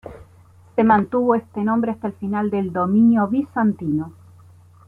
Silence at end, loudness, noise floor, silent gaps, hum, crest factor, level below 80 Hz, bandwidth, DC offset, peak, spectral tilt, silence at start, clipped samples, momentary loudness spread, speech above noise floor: 0.75 s; -20 LUFS; -49 dBFS; none; none; 16 dB; -56 dBFS; 3.7 kHz; under 0.1%; -4 dBFS; -10 dB/octave; 0.05 s; under 0.1%; 10 LU; 30 dB